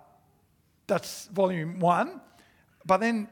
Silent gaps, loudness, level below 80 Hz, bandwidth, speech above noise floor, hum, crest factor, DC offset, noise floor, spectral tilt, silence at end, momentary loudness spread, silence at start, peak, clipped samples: none; -27 LUFS; -70 dBFS; 19 kHz; 40 dB; none; 20 dB; under 0.1%; -67 dBFS; -6 dB/octave; 0.05 s; 9 LU; 0.9 s; -10 dBFS; under 0.1%